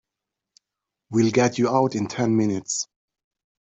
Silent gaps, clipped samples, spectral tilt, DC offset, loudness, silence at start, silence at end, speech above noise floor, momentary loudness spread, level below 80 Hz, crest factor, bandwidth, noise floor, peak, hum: none; under 0.1%; -5 dB/octave; under 0.1%; -22 LUFS; 1.1 s; 0.85 s; 64 dB; 8 LU; -64 dBFS; 18 dB; 8.2 kHz; -86 dBFS; -6 dBFS; none